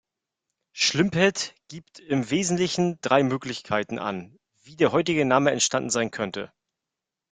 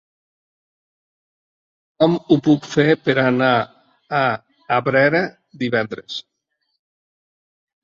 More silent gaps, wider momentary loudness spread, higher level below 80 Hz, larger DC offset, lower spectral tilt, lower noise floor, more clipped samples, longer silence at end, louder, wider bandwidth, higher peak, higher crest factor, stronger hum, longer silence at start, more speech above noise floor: neither; about the same, 15 LU vs 13 LU; about the same, -64 dBFS vs -62 dBFS; neither; second, -4 dB/octave vs -6.5 dB/octave; first, -87 dBFS vs -73 dBFS; neither; second, 0.85 s vs 1.65 s; second, -24 LUFS vs -18 LUFS; first, 9.8 kHz vs 7.4 kHz; about the same, -4 dBFS vs -2 dBFS; about the same, 22 dB vs 20 dB; neither; second, 0.75 s vs 2 s; first, 63 dB vs 56 dB